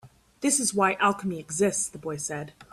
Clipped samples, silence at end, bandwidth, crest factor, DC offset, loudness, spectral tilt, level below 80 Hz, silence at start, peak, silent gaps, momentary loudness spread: under 0.1%; 0.1 s; 15.5 kHz; 18 dB; under 0.1%; -26 LUFS; -3 dB/octave; -64 dBFS; 0.05 s; -10 dBFS; none; 10 LU